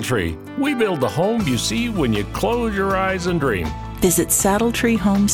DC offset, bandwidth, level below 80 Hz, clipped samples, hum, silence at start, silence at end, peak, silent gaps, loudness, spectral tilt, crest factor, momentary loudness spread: under 0.1%; 18.5 kHz; -36 dBFS; under 0.1%; none; 0 s; 0 s; -4 dBFS; none; -19 LUFS; -4.5 dB/octave; 14 dB; 6 LU